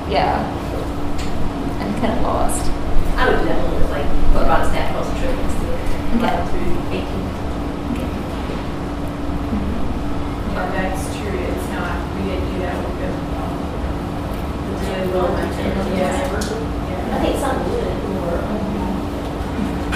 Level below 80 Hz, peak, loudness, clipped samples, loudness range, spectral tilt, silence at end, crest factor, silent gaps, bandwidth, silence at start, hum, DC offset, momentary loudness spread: -24 dBFS; 0 dBFS; -22 LUFS; under 0.1%; 3 LU; -6 dB/octave; 0 s; 18 dB; none; 14 kHz; 0 s; none; under 0.1%; 6 LU